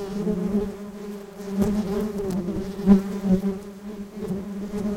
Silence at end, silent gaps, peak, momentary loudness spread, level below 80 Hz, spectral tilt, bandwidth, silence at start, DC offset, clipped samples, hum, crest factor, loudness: 0 s; none; -4 dBFS; 17 LU; -42 dBFS; -8 dB/octave; 16 kHz; 0 s; under 0.1%; under 0.1%; none; 20 dB; -25 LUFS